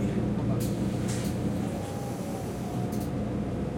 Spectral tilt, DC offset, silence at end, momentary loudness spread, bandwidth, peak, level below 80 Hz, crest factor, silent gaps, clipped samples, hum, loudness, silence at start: -7 dB/octave; under 0.1%; 0 s; 5 LU; 16.5 kHz; -18 dBFS; -46 dBFS; 12 dB; none; under 0.1%; none; -31 LUFS; 0 s